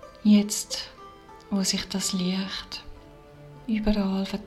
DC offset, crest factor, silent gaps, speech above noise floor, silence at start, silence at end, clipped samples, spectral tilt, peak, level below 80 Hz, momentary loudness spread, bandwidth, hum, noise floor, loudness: under 0.1%; 18 dB; none; 23 dB; 0 s; 0 s; under 0.1%; -4.5 dB/octave; -10 dBFS; -44 dBFS; 19 LU; 14 kHz; none; -48 dBFS; -26 LUFS